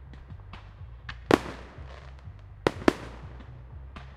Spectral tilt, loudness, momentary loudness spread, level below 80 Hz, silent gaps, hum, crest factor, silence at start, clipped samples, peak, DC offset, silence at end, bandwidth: -6 dB/octave; -28 LUFS; 21 LU; -46 dBFS; none; none; 32 dB; 0 s; under 0.1%; 0 dBFS; under 0.1%; 0 s; 16 kHz